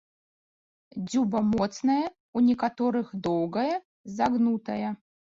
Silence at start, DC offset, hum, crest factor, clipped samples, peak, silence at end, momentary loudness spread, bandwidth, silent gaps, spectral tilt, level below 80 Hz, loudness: 0.95 s; under 0.1%; none; 16 dB; under 0.1%; -12 dBFS; 0.45 s; 10 LU; 7.6 kHz; 2.20-2.33 s, 3.85-4.04 s; -6.5 dB/octave; -62 dBFS; -27 LUFS